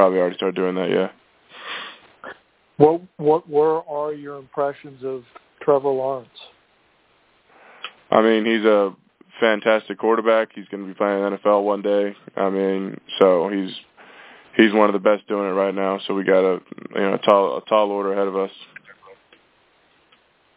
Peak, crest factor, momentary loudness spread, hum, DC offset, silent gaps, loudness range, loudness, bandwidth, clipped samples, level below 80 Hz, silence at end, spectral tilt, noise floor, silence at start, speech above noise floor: 0 dBFS; 20 dB; 15 LU; none; under 0.1%; none; 5 LU; -20 LUFS; 4 kHz; under 0.1%; -68 dBFS; 1.45 s; -9.5 dB/octave; -60 dBFS; 0 s; 40 dB